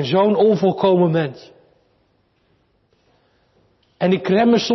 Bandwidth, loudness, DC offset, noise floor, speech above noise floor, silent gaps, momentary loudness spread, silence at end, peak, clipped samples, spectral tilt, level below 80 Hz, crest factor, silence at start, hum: 6.2 kHz; -17 LUFS; under 0.1%; -62 dBFS; 46 dB; none; 7 LU; 0 s; -6 dBFS; under 0.1%; -7 dB/octave; -60 dBFS; 14 dB; 0 s; none